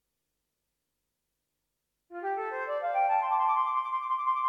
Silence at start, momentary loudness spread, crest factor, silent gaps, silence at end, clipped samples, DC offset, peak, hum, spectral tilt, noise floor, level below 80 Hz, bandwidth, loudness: 2.1 s; 8 LU; 16 dB; none; 0 s; under 0.1%; under 0.1%; -16 dBFS; none; -3 dB/octave; -84 dBFS; -86 dBFS; 6.2 kHz; -29 LUFS